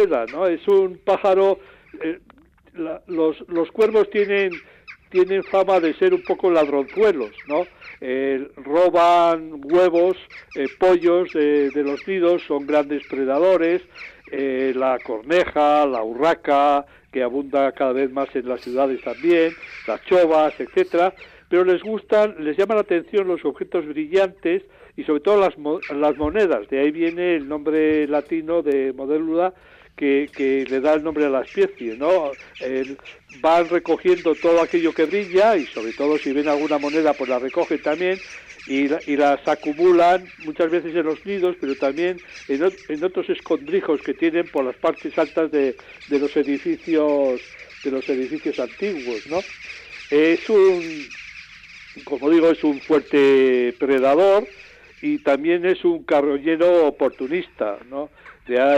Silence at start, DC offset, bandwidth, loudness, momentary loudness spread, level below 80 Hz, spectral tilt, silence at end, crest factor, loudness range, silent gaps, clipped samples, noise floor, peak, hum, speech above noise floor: 0 s; under 0.1%; 8.2 kHz; -20 LUFS; 11 LU; -56 dBFS; -6 dB/octave; 0 s; 12 dB; 4 LU; none; under 0.1%; -43 dBFS; -8 dBFS; none; 23 dB